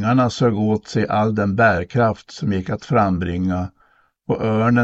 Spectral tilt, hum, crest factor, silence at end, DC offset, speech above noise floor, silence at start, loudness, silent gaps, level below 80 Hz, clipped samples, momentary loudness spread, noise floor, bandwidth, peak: -7.5 dB/octave; none; 16 dB; 0 s; under 0.1%; 40 dB; 0 s; -19 LUFS; none; -46 dBFS; under 0.1%; 9 LU; -58 dBFS; 8 kHz; -4 dBFS